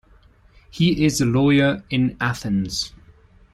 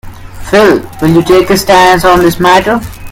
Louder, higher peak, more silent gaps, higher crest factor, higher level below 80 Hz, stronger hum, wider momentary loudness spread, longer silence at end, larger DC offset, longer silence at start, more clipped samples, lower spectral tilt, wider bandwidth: second, -20 LUFS vs -7 LUFS; second, -6 dBFS vs 0 dBFS; neither; first, 16 dB vs 8 dB; second, -46 dBFS vs -28 dBFS; neither; about the same, 9 LU vs 7 LU; first, 0.65 s vs 0 s; neither; first, 0.75 s vs 0.05 s; second, under 0.1% vs 2%; about the same, -5.5 dB/octave vs -5 dB/octave; second, 13.5 kHz vs 17 kHz